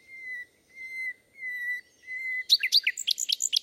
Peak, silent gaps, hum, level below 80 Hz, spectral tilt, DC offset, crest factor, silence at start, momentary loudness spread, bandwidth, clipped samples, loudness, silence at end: -8 dBFS; none; none; -82 dBFS; 5.5 dB/octave; under 0.1%; 22 dB; 0.1 s; 17 LU; 16.5 kHz; under 0.1%; -26 LUFS; 0 s